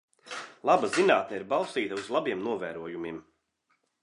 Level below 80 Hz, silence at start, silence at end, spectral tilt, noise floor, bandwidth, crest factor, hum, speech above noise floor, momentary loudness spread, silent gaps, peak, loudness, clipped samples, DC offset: -72 dBFS; 0.25 s; 0.8 s; -4 dB/octave; -75 dBFS; 11 kHz; 22 dB; none; 47 dB; 17 LU; none; -8 dBFS; -28 LUFS; under 0.1%; under 0.1%